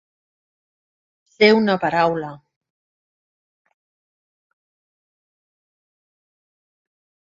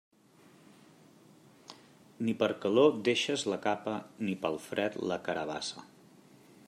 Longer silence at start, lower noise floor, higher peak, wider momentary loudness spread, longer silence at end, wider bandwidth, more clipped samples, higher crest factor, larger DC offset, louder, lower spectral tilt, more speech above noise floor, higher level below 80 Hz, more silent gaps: second, 1.4 s vs 1.7 s; first, under -90 dBFS vs -61 dBFS; first, 0 dBFS vs -12 dBFS; about the same, 13 LU vs 14 LU; first, 5 s vs 0.85 s; second, 7.6 kHz vs 14 kHz; neither; about the same, 26 dB vs 22 dB; neither; first, -17 LUFS vs -32 LUFS; first, -6.5 dB/octave vs -4.5 dB/octave; first, over 73 dB vs 30 dB; first, -64 dBFS vs -78 dBFS; neither